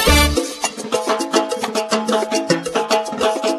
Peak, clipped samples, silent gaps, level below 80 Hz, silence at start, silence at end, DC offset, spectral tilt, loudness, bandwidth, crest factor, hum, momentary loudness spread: 0 dBFS; under 0.1%; none; -28 dBFS; 0 s; 0 s; under 0.1%; -3.5 dB/octave; -18 LUFS; 14 kHz; 18 dB; none; 6 LU